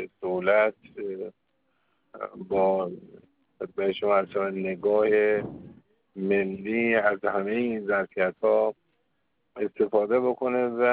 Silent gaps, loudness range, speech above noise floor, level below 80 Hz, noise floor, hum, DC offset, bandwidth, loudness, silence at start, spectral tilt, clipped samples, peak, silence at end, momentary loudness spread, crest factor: none; 4 LU; 51 dB; -68 dBFS; -76 dBFS; none; under 0.1%; 4.6 kHz; -26 LUFS; 0 s; -4.5 dB/octave; under 0.1%; -8 dBFS; 0 s; 15 LU; 18 dB